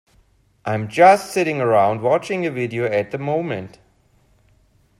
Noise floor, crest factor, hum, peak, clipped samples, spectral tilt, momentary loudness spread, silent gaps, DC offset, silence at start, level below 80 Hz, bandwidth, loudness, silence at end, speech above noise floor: -58 dBFS; 20 dB; none; 0 dBFS; under 0.1%; -6 dB/octave; 14 LU; none; under 0.1%; 0.65 s; -60 dBFS; 13.5 kHz; -19 LUFS; 1.3 s; 40 dB